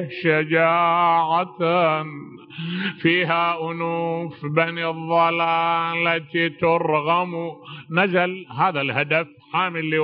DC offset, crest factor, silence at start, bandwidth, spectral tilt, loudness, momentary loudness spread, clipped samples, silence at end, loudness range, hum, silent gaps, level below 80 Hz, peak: under 0.1%; 18 dB; 0 s; 5.4 kHz; -3.5 dB/octave; -21 LUFS; 9 LU; under 0.1%; 0 s; 2 LU; none; none; -68 dBFS; -4 dBFS